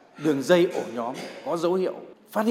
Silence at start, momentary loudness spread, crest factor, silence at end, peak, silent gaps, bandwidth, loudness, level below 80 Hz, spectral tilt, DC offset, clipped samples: 0.15 s; 12 LU; 18 dB; 0 s; -6 dBFS; none; 16 kHz; -25 LUFS; -76 dBFS; -5.5 dB/octave; under 0.1%; under 0.1%